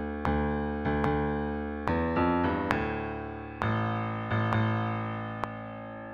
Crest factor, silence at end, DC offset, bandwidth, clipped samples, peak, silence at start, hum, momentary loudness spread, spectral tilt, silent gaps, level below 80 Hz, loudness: 26 dB; 0 s; under 0.1%; 7 kHz; under 0.1%; -4 dBFS; 0 s; none; 9 LU; -8.5 dB/octave; none; -42 dBFS; -30 LUFS